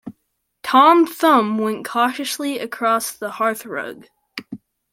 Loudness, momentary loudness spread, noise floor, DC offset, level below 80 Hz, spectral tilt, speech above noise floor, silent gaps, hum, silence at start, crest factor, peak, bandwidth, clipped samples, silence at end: -18 LUFS; 20 LU; -71 dBFS; under 0.1%; -70 dBFS; -3.5 dB/octave; 53 dB; none; none; 0.05 s; 18 dB; -2 dBFS; 16.5 kHz; under 0.1%; 0.35 s